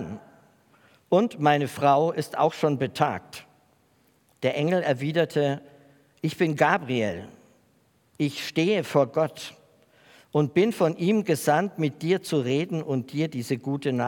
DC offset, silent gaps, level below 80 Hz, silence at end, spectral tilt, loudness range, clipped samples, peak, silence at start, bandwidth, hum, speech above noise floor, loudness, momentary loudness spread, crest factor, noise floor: under 0.1%; none; -72 dBFS; 0 s; -6 dB/octave; 3 LU; under 0.1%; -6 dBFS; 0 s; 18 kHz; none; 40 dB; -25 LUFS; 9 LU; 20 dB; -64 dBFS